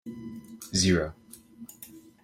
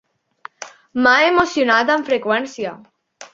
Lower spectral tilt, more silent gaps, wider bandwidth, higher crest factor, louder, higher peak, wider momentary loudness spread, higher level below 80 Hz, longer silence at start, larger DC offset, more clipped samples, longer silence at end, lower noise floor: about the same, -4 dB/octave vs -3 dB/octave; neither; first, 16.5 kHz vs 7.8 kHz; about the same, 20 dB vs 18 dB; second, -26 LUFS vs -16 LUFS; second, -10 dBFS vs -2 dBFS; first, 24 LU vs 20 LU; about the same, -54 dBFS vs -58 dBFS; second, 0.05 s vs 0.6 s; neither; neither; first, 0.25 s vs 0.1 s; first, -50 dBFS vs -42 dBFS